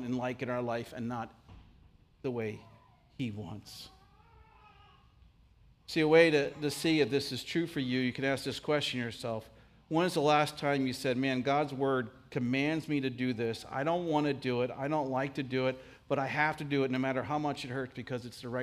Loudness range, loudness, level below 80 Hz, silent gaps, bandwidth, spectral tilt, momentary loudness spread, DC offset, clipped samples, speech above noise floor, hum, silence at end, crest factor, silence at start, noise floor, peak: 13 LU; -32 LUFS; -66 dBFS; none; 15.5 kHz; -5.5 dB/octave; 12 LU; under 0.1%; under 0.1%; 30 dB; none; 0 s; 22 dB; 0 s; -62 dBFS; -10 dBFS